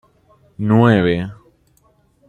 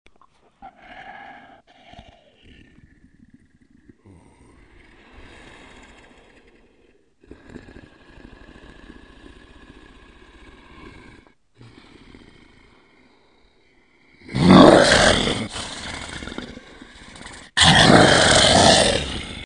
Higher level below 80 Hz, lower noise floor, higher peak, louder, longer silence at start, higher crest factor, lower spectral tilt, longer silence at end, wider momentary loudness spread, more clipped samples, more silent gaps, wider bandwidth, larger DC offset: second, -52 dBFS vs -42 dBFS; about the same, -57 dBFS vs -59 dBFS; about the same, -2 dBFS vs 0 dBFS; about the same, -15 LUFS vs -14 LUFS; about the same, 0.6 s vs 0.65 s; second, 16 dB vs 22 dB; first, -9 dB/octave vs -4 dB/octave; first, 0.95 s vs 0 s; second, 13 LU vs 28 LU; neither; neither; second, 8 kHz vs 11 kHz; neither